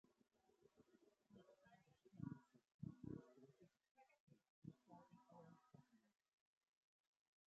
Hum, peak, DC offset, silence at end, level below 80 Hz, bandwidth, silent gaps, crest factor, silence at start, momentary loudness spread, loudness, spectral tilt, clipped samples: none; -38 dBFS; under 0.1%; 1.35 s; -84 dBFS; 7.2 kHz; 2.74-2.79 s, 3.91-3.95 s, 4.20-4.27 s, 4.50-4.62 s; 26 dB; 0.05 s; 12 LU; -61 LUFS; -9 dB/octave; under 0.1%